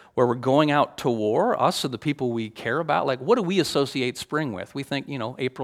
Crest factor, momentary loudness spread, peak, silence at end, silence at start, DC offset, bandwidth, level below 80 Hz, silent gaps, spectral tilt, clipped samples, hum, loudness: 18 dB; 9 LU; -4 dBFS; 0 s; 0.15 s; under 0.1%; 16 kHz; -64 dBFS; none; -5.5 dB/octave; under 0.1%; none; -24 LUFS